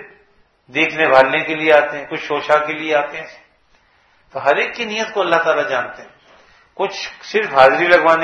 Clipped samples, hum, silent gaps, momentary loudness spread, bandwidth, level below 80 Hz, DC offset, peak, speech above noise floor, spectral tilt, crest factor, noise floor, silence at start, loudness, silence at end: 0.1%; none; none; 13 LU; 9.2 kHz; -58 dBFS; under 0.1%; 0 dBFS; 40 dB; -4 dB/octave; 18 dB; -56 dBFS; 0 s; -16 LUFS; 0 s